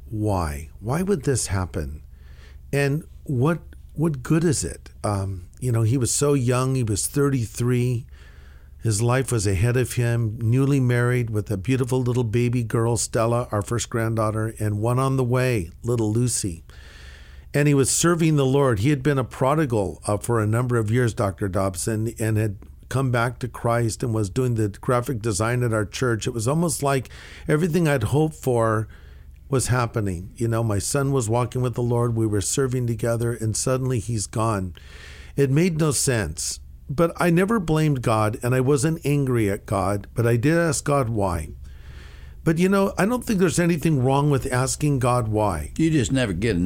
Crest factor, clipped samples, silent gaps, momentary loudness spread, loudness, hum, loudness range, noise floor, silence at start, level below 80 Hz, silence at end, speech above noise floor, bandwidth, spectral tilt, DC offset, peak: 16 dB; under 0.1%; none; 8 LU; -22 LUFS; none; 3 LU; -44 dBFS; 0 s; -42 dBFS; 0 s; 22 dB; 16.5 kHz; -6 dB/octave; under 0.1%; -6 dBFS